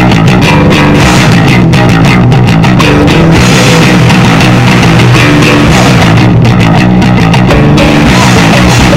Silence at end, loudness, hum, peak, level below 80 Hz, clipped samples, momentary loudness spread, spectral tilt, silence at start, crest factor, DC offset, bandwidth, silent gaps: 0 s; -3 LUFS; none; 0 dBFS; -18 dBFS; 8%; 1 LU; -5.5 dB/octave; 0 s; 4 dB; 2%; 16 kHz; none